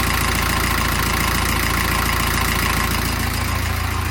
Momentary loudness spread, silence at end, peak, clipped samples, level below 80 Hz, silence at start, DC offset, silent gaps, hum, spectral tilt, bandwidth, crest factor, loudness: 3 LU; 0 s; -4 dBFS; under 0.1%; -26 dBFS; 0 s; under 0.1%; none; none; -3.5 dB/octave; 17 kHz; 16 dB; -19 LUFS